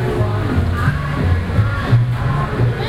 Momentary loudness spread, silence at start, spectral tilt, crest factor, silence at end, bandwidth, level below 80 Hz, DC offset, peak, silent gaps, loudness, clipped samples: 3 LU; 0 s; -8 dB/octave; 14 dB; 0 s; 12 kHz; -26 dBFS; under 0.1%; -2 dBFS; none; -17 LUFS; under 0.1%